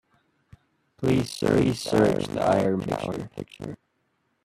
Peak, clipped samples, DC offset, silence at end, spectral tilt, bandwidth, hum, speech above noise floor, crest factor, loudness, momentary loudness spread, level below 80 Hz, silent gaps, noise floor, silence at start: -8 dBFS; under 0.1%; under 0.1%; 0.7 s; -6.5 dB/octave; 14 kHz; none; 48 dB; 18 dB; -24 LUFS; 16 LU; -54 dBFS; none; -72 dBFS; 1 s